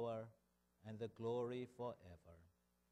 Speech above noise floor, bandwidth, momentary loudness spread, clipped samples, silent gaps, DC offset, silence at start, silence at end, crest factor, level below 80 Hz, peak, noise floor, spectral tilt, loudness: 31 dB; 11.5 kHz; 20 LU; under 0.1%; none; under 0.1%; 0 s; 0.45 s; 16 dB; -80 dBFS; -34 dBFS; -80 dBFS; -7.5 dB/octave; -48 LUFS